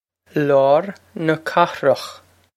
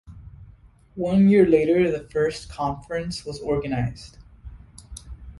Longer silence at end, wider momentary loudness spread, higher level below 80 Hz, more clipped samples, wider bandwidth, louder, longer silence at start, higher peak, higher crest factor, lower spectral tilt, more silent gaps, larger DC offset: first, 0.4 s vs 0 s; second, 12 LU vs 25 LU; second, -68 dBFS vs -44 dBFS; neither; first, 14 kHz vs 11.5 kHz; first, -18 LUFS vs -22 LUFS; first, 0.35 s vs 0.1 s; first, 0 dBFS vs -6 dBFS; about the same, 18 dB vs 18 dB; about the same, -6 dB/octave vs -7 dB/octave; neither; neither